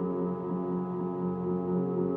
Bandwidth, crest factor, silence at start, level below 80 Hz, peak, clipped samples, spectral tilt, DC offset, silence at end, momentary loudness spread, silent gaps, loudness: 3.2 kHz; 14 dB; 0 s; -64 dBFS; -18 dBFS; under 0.1%; -12.5 dB/octave; under 0.1%; 0 s; 3 LU; none; -32 LUFS